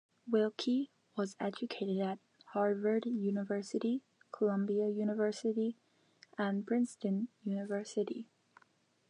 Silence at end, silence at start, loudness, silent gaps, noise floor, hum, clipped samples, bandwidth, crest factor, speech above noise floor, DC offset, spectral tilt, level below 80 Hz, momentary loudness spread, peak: 0.85 s; 0.25 s; -36 LUFS; none; -72 dBFS; none; under 0.1%; 10.5 kHz; 16 dB; 37 dB; under 0.1%; -6.5 dB/octave; under -90 dBFS; 8 LU; -20 dBFS